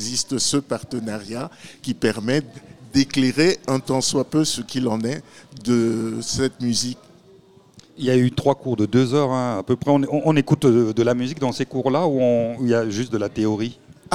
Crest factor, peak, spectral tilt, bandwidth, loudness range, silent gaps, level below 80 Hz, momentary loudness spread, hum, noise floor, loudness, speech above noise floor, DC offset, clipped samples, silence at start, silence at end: 18 dB; -2 dBFS; -5 dB/octave; 15.5 kHz; 4 LU; none; -54 dBFS; 10 LU; none; -50 dBFS; -21 LUFS; 30 dB; 0.3%; under 0.1%; 0 s; 0 s